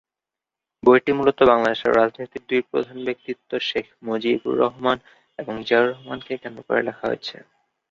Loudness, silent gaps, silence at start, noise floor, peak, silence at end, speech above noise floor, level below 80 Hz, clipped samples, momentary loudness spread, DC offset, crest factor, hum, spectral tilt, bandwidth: -21 LUFS; none; 0.85 s; -88 dBFS; -2 dBFS; 0.6 s; 67 dB; -58 dBFS; under 0.1%; 15 LU; under 0.1%; 20 dB; none; -6 dB/octave; 7.2 kHz